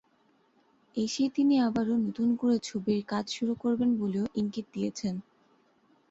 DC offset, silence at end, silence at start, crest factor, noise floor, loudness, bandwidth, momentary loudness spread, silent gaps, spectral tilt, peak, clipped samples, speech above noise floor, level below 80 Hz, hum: under 0.1%; 0.9 s; 0.95 s; 14 dB; -68 dBFS; -29 LUFS; 8 kHz; 9 LU; none; -5.5 dB/octave; -16 dBFS; under 0.1%; 39 dB; -68 dBFS; none